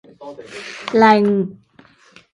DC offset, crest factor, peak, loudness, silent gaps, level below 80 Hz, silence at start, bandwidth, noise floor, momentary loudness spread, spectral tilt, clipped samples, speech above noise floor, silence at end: under 0.1%; 18 dB; 0 dBFS; -15 LUFS; none; -64 dBFS; 0.2 s; 10.5 kHz; -50 dBFS; 23 LU; -6.5 dB/octave; under 0.1%; 34 dB; 0.8 s